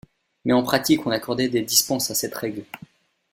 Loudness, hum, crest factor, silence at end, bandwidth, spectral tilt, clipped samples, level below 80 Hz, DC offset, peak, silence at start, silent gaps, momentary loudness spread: -22 LUFS; none; 20 dB; 0.55 s; 16.5 kHz; -3 dB/octave; under 0.1%; -60 dBFS; under 0.1%; -4 dBFS; 0.45 s; none; 14 LU